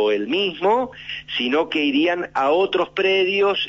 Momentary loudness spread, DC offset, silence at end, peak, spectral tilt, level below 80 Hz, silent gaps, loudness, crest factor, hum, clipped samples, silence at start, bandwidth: 5 LU; under 0.1%; 0 s; -8 dBFS; -5 dB/octave; -58 dBFS; none; -20 LUFS; 12 dB; none; under 0.1%; 0 s; 7.6 kHz